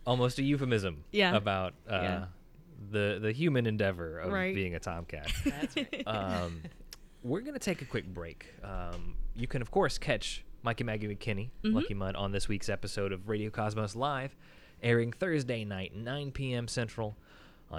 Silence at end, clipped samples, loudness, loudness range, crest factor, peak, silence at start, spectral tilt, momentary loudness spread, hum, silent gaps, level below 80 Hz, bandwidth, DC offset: 0 s; under 0.1%; -34 LUFS; 5 LU; 20 dB; -14 dBFS; 0 s; -5.5 dB/octave; 13 LU; none; none; -46 dBFS; 16 kHz; under 0.1%